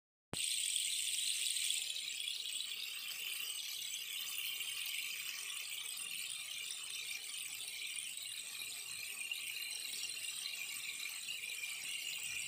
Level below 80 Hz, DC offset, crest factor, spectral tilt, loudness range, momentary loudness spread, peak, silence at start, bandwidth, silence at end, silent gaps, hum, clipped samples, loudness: -86 dBFS; under 0.1%; 24 dB; 2.5 dB/octave; 5 LU; 7 LU; -18 dBFS; 0.35 s; 16 kHz; 0 s; none; none; under 0.1%; -40 LUFS